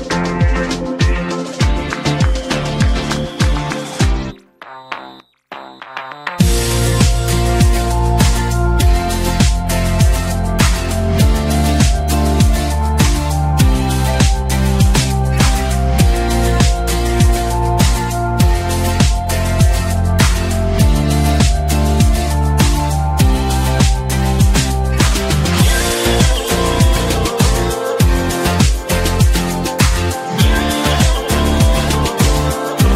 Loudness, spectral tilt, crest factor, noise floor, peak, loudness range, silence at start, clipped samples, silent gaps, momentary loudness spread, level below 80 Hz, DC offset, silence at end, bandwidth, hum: -15 LUFS; -5 dB/octave; 14 dB; -38 dBFS; 0 dBFS; 3 LU; 0 s; under 0.1%; none; 5 LU; -18 dBFS; under 0.1%; 0 s; 16 kHz; none